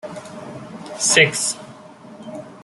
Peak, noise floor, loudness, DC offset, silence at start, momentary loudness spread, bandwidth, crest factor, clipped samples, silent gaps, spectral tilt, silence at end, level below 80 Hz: -2 dBFS; -41 dBFS; -16 LUFS; under 0.1%; 0.05 s; 22 LU; 12.5 kHz; 22 dB; under 0.1%; none; -1.5 dB/octave; 0 s; -64 dBFS